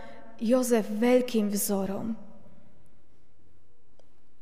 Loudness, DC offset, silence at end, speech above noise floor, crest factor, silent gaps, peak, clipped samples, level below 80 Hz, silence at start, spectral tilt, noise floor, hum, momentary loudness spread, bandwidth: -27 LUFS; 1%; 2.15 s; 38 dB; 18 dB; none; -12 dBFS; under 0.1%; -64 dBFS; 0 s; -5 dB/octave; -63 dBFS; none; 13 LU; 15.5 kHz